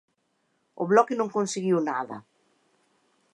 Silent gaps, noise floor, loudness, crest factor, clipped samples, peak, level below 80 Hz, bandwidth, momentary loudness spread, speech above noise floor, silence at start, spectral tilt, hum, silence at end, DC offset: none; -73 dBFS; -25 LUFS; 22 dB; under 0.1%; -6 dBFS; -82 dBFS; 11.5 kHz; 14 LU; 48 dB; 0.8 s; -5.5 dB/octave; none; 1.15 s; under 0.1%